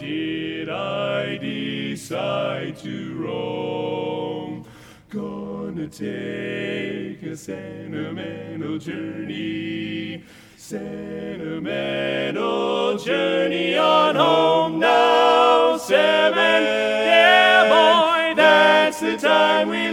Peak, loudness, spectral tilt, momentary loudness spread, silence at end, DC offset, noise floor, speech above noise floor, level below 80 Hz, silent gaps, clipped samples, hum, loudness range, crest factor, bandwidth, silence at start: -2 dBFS; -19 LUFS; -4.5 dB/octave; 18 LU; 0 s; under 0.1%; -45 dBFS; 24 dB; -60 dBFS; none; under 0.1%; none; 15 LU; 18 dB; 16 kHz; 0 s